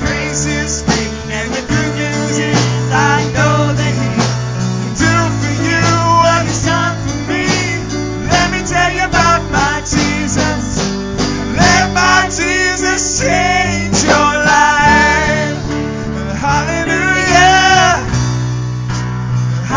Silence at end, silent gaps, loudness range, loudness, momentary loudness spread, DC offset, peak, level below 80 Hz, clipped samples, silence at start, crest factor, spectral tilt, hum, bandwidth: 0 s; none; 3 LU; -13 LUFS; 9 LU; under 0.1%; 0 dBFS; -28 dBFS; under 0.1%; 0 s; 12 dB; -4 dB/octave; none; 7.6 kHz